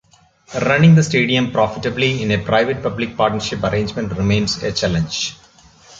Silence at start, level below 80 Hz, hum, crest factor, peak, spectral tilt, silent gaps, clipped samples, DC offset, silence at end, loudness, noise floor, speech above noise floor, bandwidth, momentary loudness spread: 0.5 s; -42 dBFS; none; 16 dB; -2 dBFS; -5.5 dB/octave; none; under 0.1%; under 0.1%; 0.65 s; -17 LUFS; -49 dBFS; 32 dB; 7.8 kHz; 10 LU